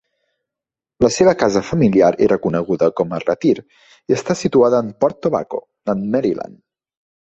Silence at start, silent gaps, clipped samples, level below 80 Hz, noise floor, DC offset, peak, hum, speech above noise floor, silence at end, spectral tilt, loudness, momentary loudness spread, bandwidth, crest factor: 1 s; none; under 0.1%; -50 dBFS; -87 dBFS; under 0.1%; -2 dBFS; none; 71 dB; 0.85 s; -6 dB/octave; -17 LUFS; 9 LU; 8.2 kHz; 16 dB